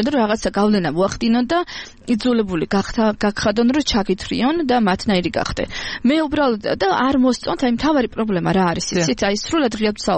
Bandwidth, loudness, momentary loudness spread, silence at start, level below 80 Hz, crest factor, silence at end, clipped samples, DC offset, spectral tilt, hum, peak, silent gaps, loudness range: 8.8 kHz; -18 LUFS; 4 LU; 0 s; -40 dBFS; 12 dB; 0 s; under 0.1%; under 0.1%; -5 dB/octave; none; -6 dBFS; none; 1 LU